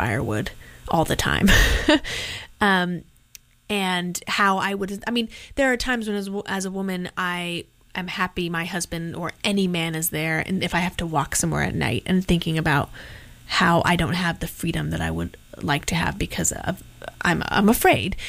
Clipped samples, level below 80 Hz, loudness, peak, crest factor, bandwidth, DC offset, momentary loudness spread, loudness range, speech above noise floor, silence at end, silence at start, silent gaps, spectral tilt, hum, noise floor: under 0.1%; -36 dBFS; -23 LUFS; -4 dBFS; 18 dB; 16 kHz; under 0.1%; 12 LU; 4 LU; 28 dB; 0 s; 0 s; none; -4 dB/octave; none; -51 dBFS